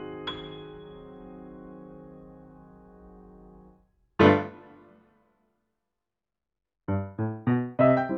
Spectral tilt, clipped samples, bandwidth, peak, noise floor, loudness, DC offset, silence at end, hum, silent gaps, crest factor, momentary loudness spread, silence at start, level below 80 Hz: -6 dB/octave; under 0.1%; 6.8 kHz; -4 dBFS; -89 dBFS; -26 LUFS; under 0.1%; 0 s; none; none; 26 dB; 27 LU; 0 s; -60 dBFS